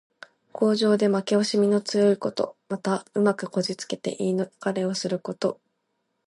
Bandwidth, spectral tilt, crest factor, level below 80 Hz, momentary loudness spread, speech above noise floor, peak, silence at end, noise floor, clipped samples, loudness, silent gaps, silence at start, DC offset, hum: 11.5 kHz; -5.5 dB/octave; 16 dB; -74 dBFS; 9 LU; 52 dB; -8 dBFS; 0.75 s; -76 dBFS; under 0.1%; -25 LUFS; none; 0.55 s; under 0.1%; none